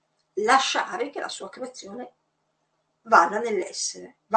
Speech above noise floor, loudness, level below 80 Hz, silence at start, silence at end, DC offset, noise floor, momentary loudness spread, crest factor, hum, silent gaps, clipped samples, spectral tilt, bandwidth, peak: 49 dB; -23 LUFS; -78 dBFS; 0.35 s; 0 s; under 0.1%; -74 dBFS; 20 LU; 24 dB; none; none; under 0.1%; -1.5 dB/octave; 9 kHz; -2 dBFS